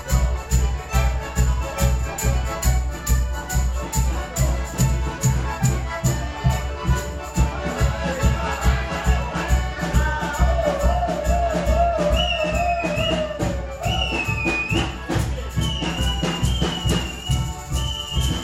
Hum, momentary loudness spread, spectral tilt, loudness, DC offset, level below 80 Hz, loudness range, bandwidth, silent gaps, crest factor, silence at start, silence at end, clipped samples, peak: none; 4 LU; -4.5 dB/octave; -22 LUFS; under 0.1%; -24 dBFS; 2 LU; 16 kHz; none; 16 dB; 0 s; 0 s; under 0.1%; -6 dBFS